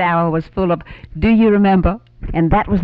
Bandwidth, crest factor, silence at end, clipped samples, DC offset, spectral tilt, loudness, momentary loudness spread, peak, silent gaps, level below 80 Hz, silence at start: 5 kHz; 12 dB; 0 s; under 0.1%; under 0.1%; -10.5 dB/octave; -16 LUFS; 11 LU; -2 dBFS; none; -28 dBFS; 0 s